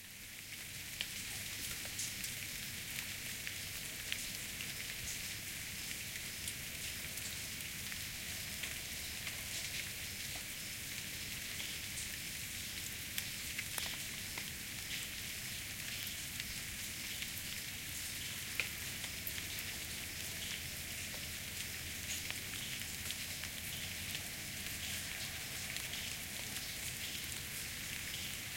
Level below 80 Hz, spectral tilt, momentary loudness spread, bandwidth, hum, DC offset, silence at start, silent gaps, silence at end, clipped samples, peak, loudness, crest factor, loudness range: -60 dBFS; -1 dB/octave; 2 LU; 17 kHz; none; under 0.1%; 0 s; none; 0 s; under 0.1%; -16 dBFS; -41 LUFS; 28 dB; 1 LU